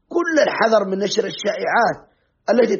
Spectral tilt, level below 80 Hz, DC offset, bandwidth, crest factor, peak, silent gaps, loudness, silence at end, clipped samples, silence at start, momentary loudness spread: -2.5 dB/octave; -64 dBFS; under 0.1%; 7.2 kHz; 14 dB; -4 dBFS; none; -19 LUFS; 0 s; under 0.1%; 0.1 s; 7 LU